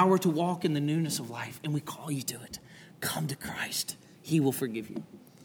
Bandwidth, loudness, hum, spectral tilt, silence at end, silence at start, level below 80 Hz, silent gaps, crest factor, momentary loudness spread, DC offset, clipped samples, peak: over 20 kHz; -31 LUFS; none; -5 dB/octave; 0 s; 0 s; -70 dBFS; none; 22 dB; 15 LU; under 0.1%; under 0.1%; -10 dBFS